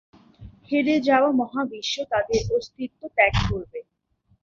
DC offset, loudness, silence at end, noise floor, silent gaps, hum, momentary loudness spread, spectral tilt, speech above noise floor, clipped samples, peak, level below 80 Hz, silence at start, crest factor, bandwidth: under 0.1%; -23 LUFS; 0.6 s; -65 dBFS; none; none; 14 LU; -5.5 dB/octave; 43 dB; under 0.1%; -4 dBFS; -40 dBFS; 0.4 s; 20 dB; 7.6 kHz